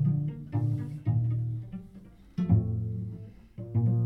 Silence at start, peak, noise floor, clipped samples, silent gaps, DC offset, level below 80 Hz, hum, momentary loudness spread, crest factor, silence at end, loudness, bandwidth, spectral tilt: 0 s; -12 dBFS; -51 dBFS; under 0.1%; none; under 0.1%; -50 dBFS; none; 18 LU; 18 dB; 0 s; -31 LUFS; 3 kHz; -11.5 dB/octave